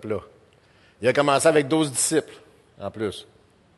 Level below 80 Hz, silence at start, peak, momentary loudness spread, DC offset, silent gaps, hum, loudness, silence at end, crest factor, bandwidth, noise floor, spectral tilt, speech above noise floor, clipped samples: -60 dBFS; 0.05 s; -6 dBFS; 17 LU; under 0.1%; none; none; -22 LUFS; 0.55 s; 18 dB; 12.5 kHz; -57 dBFS; -3.5 dB/octave; 34 dB; under 0.1%